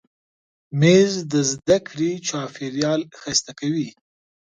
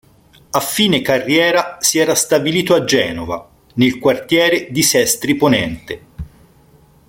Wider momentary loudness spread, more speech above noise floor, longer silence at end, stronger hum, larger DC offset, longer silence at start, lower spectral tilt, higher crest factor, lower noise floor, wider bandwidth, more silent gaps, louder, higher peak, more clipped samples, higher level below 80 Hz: second, 12 LU vs 15 LU; first, over 70 dB vs 34 dB; second, 0.65 s vs 0.85 s; neither; neither; first, 0.7 s vs 0.55 s; first, -4.5 dB/octave vs -3 dB/octave; about the same, 20 dB vs 16 dB; first, under -90 dBFS vs -49 dBFS; second, 9.6 kHz vs 17 kHz; neither; second, -21 LUFS vs -14 LUFS; about the same, -2 dBFS vs -2 dBFS; neither; second, -58 dBFS vs -46 dBFS